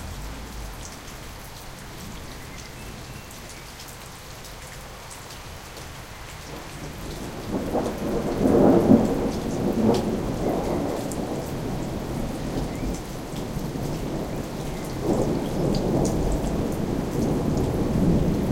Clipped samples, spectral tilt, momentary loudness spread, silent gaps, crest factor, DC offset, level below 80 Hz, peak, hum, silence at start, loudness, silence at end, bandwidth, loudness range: under 0.1%; -6.5 dB/octave; 17 LU; none; 22 dB; under 0.1%; -36 dBFS; -2 dBFS; none; 0 s; -25 LUFS; 0 s; 17 kHz; 16 LU